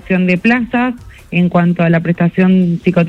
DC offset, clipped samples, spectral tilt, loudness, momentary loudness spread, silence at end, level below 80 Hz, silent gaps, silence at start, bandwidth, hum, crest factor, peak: under 0.1%; under 0.1%; -9 dB/octave; -13 LUFS; 6 LU; 0 s; -44 dBFS; none; 0.05 s; 5.6 kHz; none; 12 dB; 0 dBFS